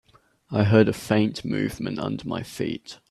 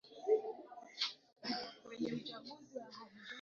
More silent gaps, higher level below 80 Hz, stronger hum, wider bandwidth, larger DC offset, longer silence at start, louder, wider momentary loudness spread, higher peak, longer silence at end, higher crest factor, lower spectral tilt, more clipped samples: neither; first, -54 dBFS vs -84 dBFS; neither; first, 13.5 kHz vs 7.2 kHz; neither; first, 0.5 s vs 0.05 s; first, -24 LUFS vs -42 LUFS; second, 12 LU vs 16 LU; first, -4 dBFS vs -22 dBFS; first, 0.15 s vs 0 s; about the same, 20 dB vs 20 dB; first, -7 dB/octave vs -2 dB/octave; neither